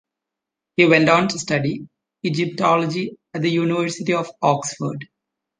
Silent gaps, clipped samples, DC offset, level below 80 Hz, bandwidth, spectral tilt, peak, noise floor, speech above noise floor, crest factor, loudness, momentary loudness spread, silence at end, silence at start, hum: none; under 0.1%; under 0.1%; -62 dBFS; 10 kHz; -5 dB/octave; -2 dBFS; -85 dBFS; 65 dB; 20 dB; -20 LUFS; 14 LU; 0.55 s; 0.8 s; none